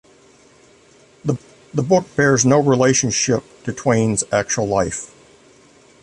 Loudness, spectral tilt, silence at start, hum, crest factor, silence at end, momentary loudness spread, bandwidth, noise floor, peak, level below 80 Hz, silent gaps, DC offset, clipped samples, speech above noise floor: -18 LUFS; -4.5 dB/octave; 1.25 s; none; 18 dB; 0.95 s; 13 LU; 11.5 kHz; -50 dBFS; -2 dBFS; -50 dBFS; none; under 0.1%; under 0.1%; 33 dB